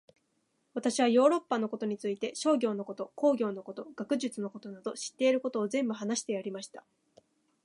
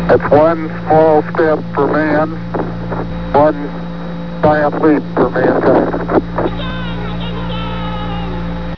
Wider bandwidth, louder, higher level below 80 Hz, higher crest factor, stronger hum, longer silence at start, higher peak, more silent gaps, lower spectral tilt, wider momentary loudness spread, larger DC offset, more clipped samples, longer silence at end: first, 11.5 kHz vs 5.4 kHz; second, -31 LUFS vs -15 LUFS; second, -84 dBFS vs -32 dBFS; first, 20 dB vs 14 dB; neither; first, 0.75 s vs 0 s; second, -12 dBFS vs 0 dBFS; neither; second, -4 dB/octave vs -9 dB/octave; first, 14 LU vs 11 LU; second, under 0.1% vs 3%; second, under 0.1% vs 0.1%; first, 0.85 s vs 0 s